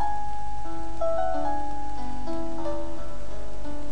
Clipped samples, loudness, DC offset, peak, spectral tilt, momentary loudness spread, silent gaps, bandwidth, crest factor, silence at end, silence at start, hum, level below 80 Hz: under 0.1%; -33 LUFS; 10%; -12 dBFS; -6.5 dB/octave; 12 LU; none; 10.5 kHz; 14 dB; 0 s; 0 s; none; -40 dBFS